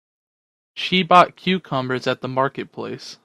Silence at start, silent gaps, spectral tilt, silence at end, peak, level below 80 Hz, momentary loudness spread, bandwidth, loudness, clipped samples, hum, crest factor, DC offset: 0.75 s; none; -5.5 dB/octave; 0.1 s; 0 dBFS; -62 dBFS; 17 LU; 11 kHz; -19 LUFS; under 0.1%; none; 22 dB; under 0.1%